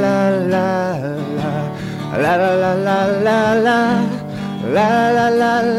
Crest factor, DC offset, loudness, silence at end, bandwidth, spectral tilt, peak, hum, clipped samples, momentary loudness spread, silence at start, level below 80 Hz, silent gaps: 12 dB; under 0.1%; -16 LUFS; 0 s; 15.5 kHz; -6.5 dB/octave; -4 dBFS; none; under 0.1%; 9 LU; 0 s; -50 dBFS; none